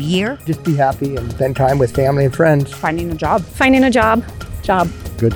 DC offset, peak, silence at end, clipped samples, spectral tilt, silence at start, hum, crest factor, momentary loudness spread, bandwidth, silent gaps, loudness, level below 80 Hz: under 0.1%; 0 dBFS; 0 s; under 0.1%; -6.5 dB/octave; 0 s; none; 14 dB; 9 LU; 19.5 kHz; none; -16 LUFS; -34 dBFS